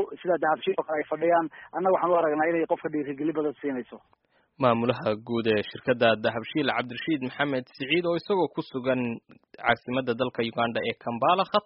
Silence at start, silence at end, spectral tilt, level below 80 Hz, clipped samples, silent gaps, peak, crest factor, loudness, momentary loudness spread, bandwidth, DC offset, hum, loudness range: 0 s; 0.05 s; -3.5 dB/octave; -66 dBFS; under 0.1%; none; -6 dBFS; 20 dB; -27 LUFS; 7 LU; 5.8 kHz; under 0.1%; none; 2 LU